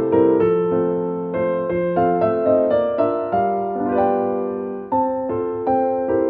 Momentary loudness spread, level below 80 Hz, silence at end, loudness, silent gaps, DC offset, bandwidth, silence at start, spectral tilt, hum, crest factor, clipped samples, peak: 6 LU; -52 dBFS; 0 s; -20 LUFS; none; under 0.1%; 4.3 kHz; 0 s; -11.5 dB/octave; none; 14 dB; under 0.1%; -4 dBFS